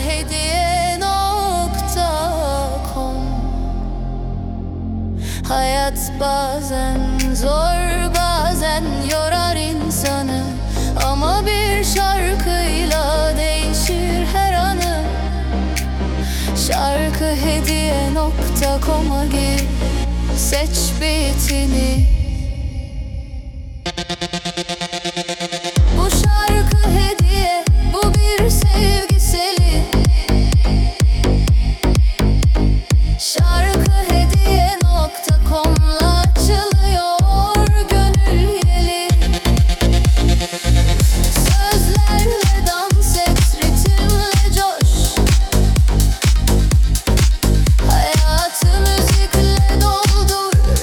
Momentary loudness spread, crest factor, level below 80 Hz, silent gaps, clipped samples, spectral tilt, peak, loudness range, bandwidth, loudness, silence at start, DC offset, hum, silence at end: 8 LU; 12 dB; -16 dBFS; none; under 0.1%; -4.5 dB/octave; -2 dBFS; 6 LU; 18 kHz; -16 LUFS; 0 s; under 0.1%; none; 0 s